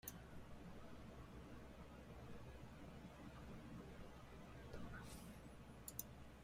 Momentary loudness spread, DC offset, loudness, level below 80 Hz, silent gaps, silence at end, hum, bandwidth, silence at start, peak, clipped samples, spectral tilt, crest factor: 6 LU; under 0.1%; -58 LUFS; -64 dBFS; none; 0 s; none; 16 kHz; 0.05 s; -30 dBFS; under 0.1%; -5 dB/octave; 26 dB